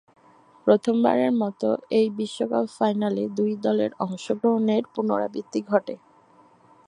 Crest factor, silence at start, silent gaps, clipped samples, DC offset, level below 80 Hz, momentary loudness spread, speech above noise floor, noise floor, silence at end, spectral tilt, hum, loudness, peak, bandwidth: 20 dB; 0.65 s; none; under 0.1%; under 0.1%; -74 dBFS; 8 LU; 33 dB; -56 dBFS; 0.9 s; -6.5 dB/octave; none; -24 LUFS; -4 dBFS; 10.5 kHz